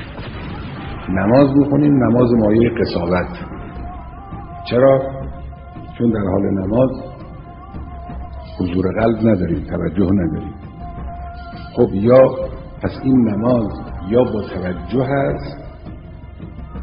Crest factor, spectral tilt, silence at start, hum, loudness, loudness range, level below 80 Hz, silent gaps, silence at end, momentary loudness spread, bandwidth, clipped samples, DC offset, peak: 18 dB; -12.5 dB/octave; 0 s; none; -16 LUFS; 5 LU; -34 dBFS; none; 0 s; 21 LU; 5.4 kHz; under 0.1%; under 0.1%; 0 dBFS